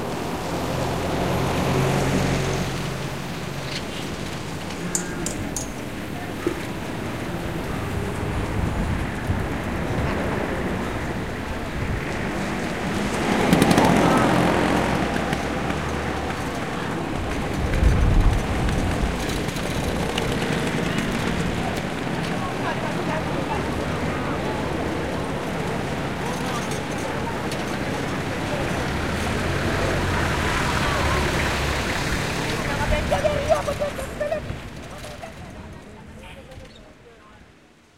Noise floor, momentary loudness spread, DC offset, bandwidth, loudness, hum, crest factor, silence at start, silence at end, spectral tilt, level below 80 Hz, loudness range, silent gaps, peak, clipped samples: -52 dBFS; 9 LU; 0.9%; 16 kHz; -24 LUFS; none; 22 dB; 0 s; 0 s; -5 dB/octave; -32 dBFS; 8 LU; none; -2 dBFS; under 0.1%